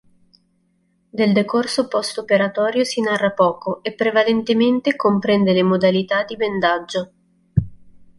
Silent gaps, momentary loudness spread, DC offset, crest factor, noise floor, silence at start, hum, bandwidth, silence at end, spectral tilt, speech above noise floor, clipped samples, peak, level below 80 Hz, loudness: none; 8 LU; under 0.1%; 16 dB; -64 dBFS; 1.15 s; none; 11.5 kHz; 0.15 s; -5.5 dB/octave; 46 dB; under 0.1%; -2 dBFS; -48 dBFS; -19 LUFS